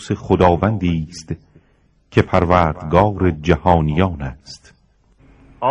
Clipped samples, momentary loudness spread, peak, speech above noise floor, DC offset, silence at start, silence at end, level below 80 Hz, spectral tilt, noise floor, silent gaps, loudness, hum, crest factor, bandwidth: under 0.1%; 16 LU; 0 dBFS; 40 dB; under 0.1%; 0 s; 0 s; -38 dBFS; -7.5 dB/octave; -57 dBFS; none; -17 LUFS; none; 18 dB; 10.5 kHz